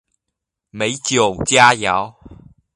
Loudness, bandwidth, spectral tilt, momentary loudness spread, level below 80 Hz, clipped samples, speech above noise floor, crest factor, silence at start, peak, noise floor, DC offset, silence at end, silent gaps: -15 LUFS; 11.5 kHz; -2.5 dB/octave; 11 LU; -46 dBFS; under 0.1%; 64 dB; 18 dB; 0.75 s; 0 dBFS; -80 dBFS; under 0.1%; 0.4 s; none